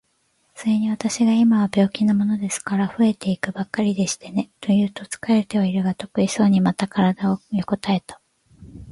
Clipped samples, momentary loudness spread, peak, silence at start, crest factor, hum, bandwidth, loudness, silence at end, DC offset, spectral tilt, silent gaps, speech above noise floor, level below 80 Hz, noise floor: under 0.1%; 8 LU; -4 dBFS; 0.55 s; 16 dB; none; 11.5 kHz; -21 LUFS; 0 s; under 0.1%; -6 dB/octave; none; 46 dB; -56 dBFS; -66 dBFS